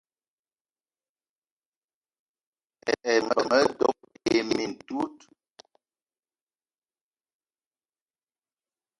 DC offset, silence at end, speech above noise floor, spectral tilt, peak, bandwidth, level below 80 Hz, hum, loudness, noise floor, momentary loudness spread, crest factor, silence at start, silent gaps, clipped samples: under 0.1%; 3.85 s; over 65 dB; -3.5 dB/octave; -8 dBFS; 11.5 kHz; -68 dBFS; none; -26 LUFS; under -90 dBFS; 10 LU; 24 dB; 2.85 s; none; under 0.1%